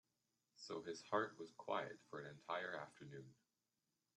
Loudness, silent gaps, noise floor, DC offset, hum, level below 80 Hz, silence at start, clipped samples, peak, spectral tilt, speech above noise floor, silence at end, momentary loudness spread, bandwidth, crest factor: -48 LUFS; none; under -90 dBFS; under 0.1%; none; under -90 dBFS; 0.55 s; under 0.1%; -26 dBFS; -4.5 dB/octave; over 42 dB; 0.85 s; 15 LU; 10.5 kHz; 24 dB